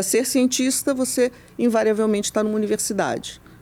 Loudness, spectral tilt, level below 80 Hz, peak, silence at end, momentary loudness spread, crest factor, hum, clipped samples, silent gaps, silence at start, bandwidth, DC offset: -21 LUFS; -3.5 dB/octave; -56 dBFS; -8 dBFS; 0.05 s; 5 LU; 12 dB; none; under 0.1%; none; 0 s; 17.5 kHz; under 0.1%